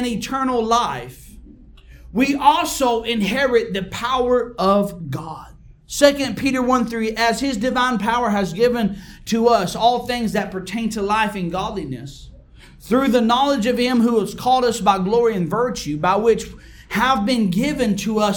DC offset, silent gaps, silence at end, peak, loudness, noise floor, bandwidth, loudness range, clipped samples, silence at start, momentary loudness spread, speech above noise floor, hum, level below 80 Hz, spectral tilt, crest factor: under 0.1%; none; 0 s; 0 dBFS; -19 LUFS; -44 dBFS; 19 kHz; 3 LU; under 0.1%; 0 s; 10 LU; 25 dB; none; -44 dBFS; -5 dB/octave; 20 dB